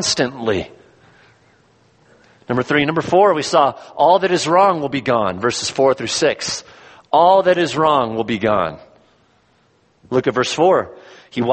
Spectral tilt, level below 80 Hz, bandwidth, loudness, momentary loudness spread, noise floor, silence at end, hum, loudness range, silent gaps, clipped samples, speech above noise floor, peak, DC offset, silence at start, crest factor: -4 dB/octave; -54 dBFS; 8.8 kHz; -16 LUFS; 9 LU; -58 dBFS; 0 s; none; 5 LU; none; under 0.1%; 42 dB; -2 dBFS; under 0.1%; 0 s; 16 dB